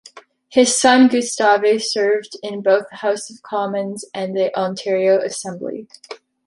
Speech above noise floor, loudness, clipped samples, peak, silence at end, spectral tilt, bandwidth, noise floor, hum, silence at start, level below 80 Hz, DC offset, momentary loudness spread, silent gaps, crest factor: 26 dB; -18 LUFS; under 0.1%; -2 dBFS; 0.3 s; -3 dB/octave; 11.5 kHz; -44 dBFS; none; 0.15 s; -66 dBFS; under 0.1%; 16 LU; none; 18 dB